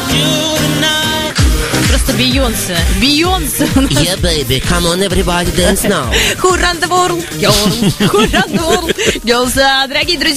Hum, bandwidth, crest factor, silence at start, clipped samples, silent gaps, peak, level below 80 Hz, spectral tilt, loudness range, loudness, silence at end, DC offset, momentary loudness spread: none; 15.5 kHz; 12 dB; 0 s; under 0.1%; none; 0 dBFS; -22 dBFS; -3.5 dB/octave; 1 LU; -11 LUFS; 0 s; 0.5%; 3 LU